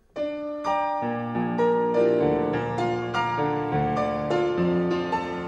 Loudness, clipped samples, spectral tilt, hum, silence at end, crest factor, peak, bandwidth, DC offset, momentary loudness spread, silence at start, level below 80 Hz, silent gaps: -25 LUFS; under 0.1%; -7.5 dB/octave; none; 0 s; 14 dB; -10 dBFS; 8.6 kHz; under 0.1%; 6 LU; 0.15 s; -52 dBFS; none